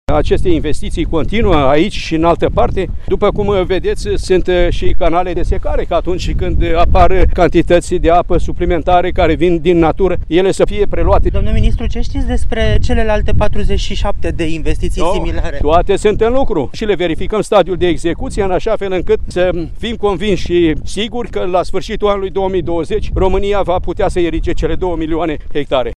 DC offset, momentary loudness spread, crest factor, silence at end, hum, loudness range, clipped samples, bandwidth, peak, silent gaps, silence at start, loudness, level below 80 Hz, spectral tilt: under 0.1%; 7 LU; 12 dB; 0.05 s; none; 4 LU; under 0.1%; 10.5 kHz; 0 dBFS; none; 0.1 s; -15 LUFS; -18 dBFS; -6.5 dB/octave